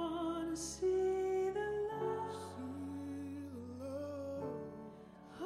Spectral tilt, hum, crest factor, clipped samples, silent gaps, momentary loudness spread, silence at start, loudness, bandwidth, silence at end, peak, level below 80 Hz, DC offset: -5.5 dB/octave; none; 14 dB; under 0.1%; none; 13 LU; 0 s; -40 LUFS; 13 kHz; 0 s; -26 dBFS; -66 dBFS; under 0.1%